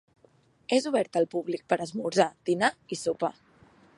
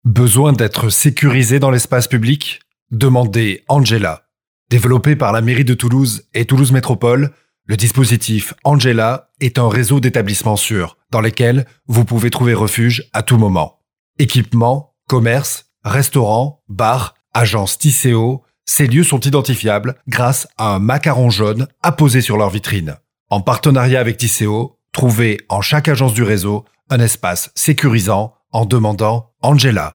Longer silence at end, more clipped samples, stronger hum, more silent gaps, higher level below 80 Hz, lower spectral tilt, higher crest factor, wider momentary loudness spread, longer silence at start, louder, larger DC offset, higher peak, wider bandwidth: first, 0.65 s vs 0.05 s; neither; neither; second, none vs 2.82-2.86 s, 4.47-4.66 s, 13.99-14.14 s, 23.20-23.26 s; second, -74 dBFS vs -48 dBFS; about the same, -4.5 dB/octave vs -5 dB/octave; first, 22 dB vs 14 dB; about the same, 7 LU vs 7 LU; first, 0.7 s vs 0.05 s; second, -28 LUFS vs -14 LUFS; neither; second, -8 dBFS vs 0 dBFS; second, 11.5 kHz vs 19 kHz